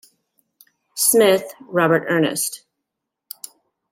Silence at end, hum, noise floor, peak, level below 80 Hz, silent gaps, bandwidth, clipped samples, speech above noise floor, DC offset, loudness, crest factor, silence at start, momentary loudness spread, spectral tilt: 1.35 s; none; -81 dBFS; -4 dBFS; -68 dBFS; none; 16.5 kHz; under 0.1%; 63 dB; under 0.1%; -18 LUFS; 18 dB; 0.95 s; 23 LU; -3.5 dB/octave